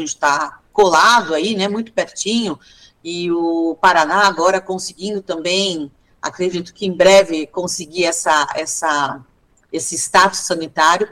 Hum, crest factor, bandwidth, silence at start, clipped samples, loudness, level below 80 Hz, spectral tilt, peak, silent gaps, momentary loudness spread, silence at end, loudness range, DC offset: none; 14 dB; 16 kHz; 0 s; under 0.1%; -16 LUFS; -54 dBFS; -2.5 dB/octave; -2 dBFS; none; 14 LU; 0 s; 1 LU; under 0.1%